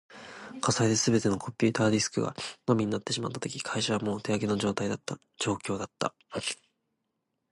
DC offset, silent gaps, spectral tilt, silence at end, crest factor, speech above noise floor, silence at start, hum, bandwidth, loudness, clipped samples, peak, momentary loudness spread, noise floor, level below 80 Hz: under 0.1%; none; -4.5 dB/octave; 0.95 s; 20 dB; 52 dB; 0.1 s; none; 11.5 kHz; -29 LUFS; under 0.1%; -10 dBFS; 10 LU; -81 dBFS; -62 dBFS